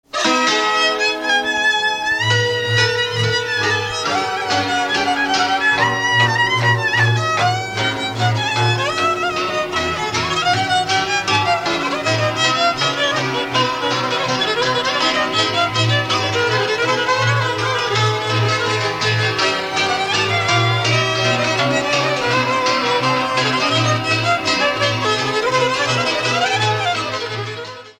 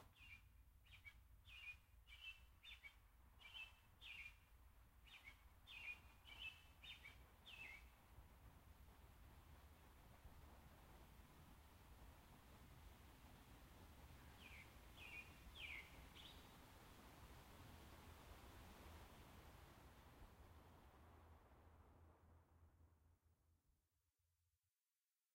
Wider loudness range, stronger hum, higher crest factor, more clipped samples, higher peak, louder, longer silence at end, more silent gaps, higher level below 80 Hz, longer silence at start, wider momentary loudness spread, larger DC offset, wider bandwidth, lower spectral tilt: second, 2 LU vs 8 LU; neither; second, 14 dB vs 20 dB; neither; first, -2 dBFS vs -44 dBFS; first, -16 LUFS vs -62 LUFS; second, 0.1 s vs 0.75 s; neither; first, -50 dBFS vs -70 dBFS; first, 0.15 s vs 0 s; second, 4 LU vs 11 LU; neither; about the same, 16 kHz vs 16 kHz; about the same, -3.5 dB/octave vs -3.5 dB/octave